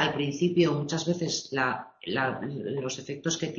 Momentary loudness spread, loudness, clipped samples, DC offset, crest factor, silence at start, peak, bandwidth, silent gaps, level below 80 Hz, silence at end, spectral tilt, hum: 8 LU; -29 LUFS; under 0.1%; under 0.1%; 20 dB; 0 s; -10 dBFS; 7.6 kHz; none; -64 dBFS; 0 s; -4.5 dB/octave; none